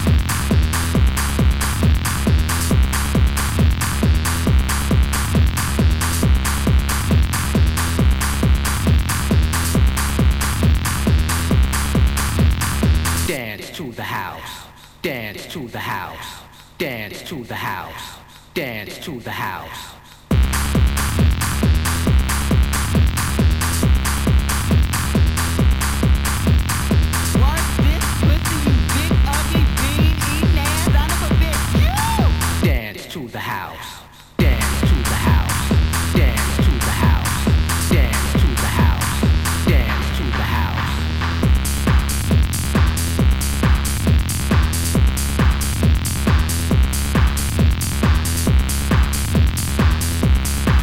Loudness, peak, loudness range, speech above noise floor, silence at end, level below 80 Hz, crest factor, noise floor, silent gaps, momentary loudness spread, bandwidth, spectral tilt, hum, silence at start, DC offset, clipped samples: -18 LUFS; -4 dBFS; 7 LU; 13 dB; 0 s; -20 dBFS; 14 dB; -39 dBFS; none; 9 LU; 17 kHz; -5 dB/octave; none; 0 s; 0.8%; under 0.1%